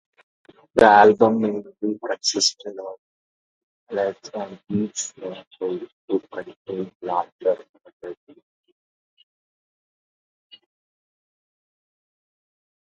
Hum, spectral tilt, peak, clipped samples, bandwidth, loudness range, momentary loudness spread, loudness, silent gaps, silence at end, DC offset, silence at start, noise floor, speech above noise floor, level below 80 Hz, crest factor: none; -3.5 dB/octave; 0 dBFS; under 0.1%; 11 kHz; 12 LU; 21 LU; -21 LUFS; 2.98-3.87 s, 5.47-5.51 s, 5.92-6.08 s, 6.56-6.65 s, 6.95-7.00 s, 7.32-7.39 s, 7.69-7.74 s, 7.93-8.00 s; 4.85 s; under 0.1%; 0.75 s; under -90 dBFS; over 68 dB; -62 dBFS; 24 dB